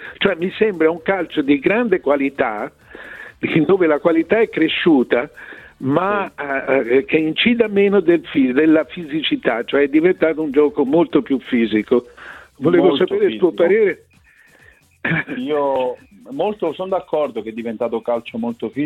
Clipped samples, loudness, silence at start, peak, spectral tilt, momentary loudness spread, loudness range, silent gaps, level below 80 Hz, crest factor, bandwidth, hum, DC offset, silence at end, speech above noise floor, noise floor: under 0.1%; -17 LUFS; 0 s; -2 dBFS; -7.5 dB/octave; 12 LU; 6 LU; none; -56 dBFS; 16 dB; 4.4 kHz; none; under 0.1%; 0 s; 34 dB; -51 dBFS